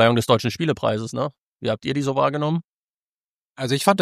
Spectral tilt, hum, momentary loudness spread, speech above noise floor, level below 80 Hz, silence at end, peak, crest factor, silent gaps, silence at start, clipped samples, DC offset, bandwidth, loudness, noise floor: -5.5 dB/octave; none; 9 LU; over 69 dB; -60 dBFS; 0 s; -2 dBFS; 20 dB; 1.38-1.59 s, 2.64-3.55 s; 0 s; under 0.1%; under 0.1%; 15.5 kHz; -23 LUFS; under -90 dBFS